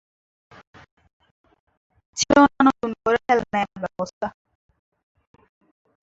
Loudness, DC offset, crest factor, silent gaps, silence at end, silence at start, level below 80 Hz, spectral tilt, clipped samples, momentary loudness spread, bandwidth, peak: -21 LUFS; under 0.1%; 20 dB; 4.13-4.21 s; 1.75 s; 2.15 s; -54 dBFS; -4 dB/octave; under 0.1%; 15 LU; 8 kHz; -4 dBFS